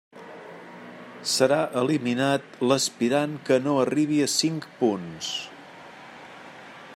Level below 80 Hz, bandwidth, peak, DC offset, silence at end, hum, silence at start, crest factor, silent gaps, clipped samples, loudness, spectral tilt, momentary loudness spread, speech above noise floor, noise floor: -74 dBFS; 16 kHz; -6 dBFS; under 0.1%; 0 s; none; 0.15 s; 20 dB; none; under 0.1%; -24 LUFS; -4 dB/octave; 21 LU; 21 dB; -45 dBFS